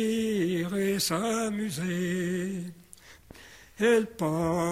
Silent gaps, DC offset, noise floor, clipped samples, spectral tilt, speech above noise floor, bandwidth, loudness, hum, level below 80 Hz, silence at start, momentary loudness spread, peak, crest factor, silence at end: none; under 0.1%; -52 dBFS; under 0.1%; -5 dB/octave; 24 dB; 16 kHz; -28 LUFS; none; -58 dBFS; 0 s; 14 LU; -12 dBFS; 16 dB; 0 s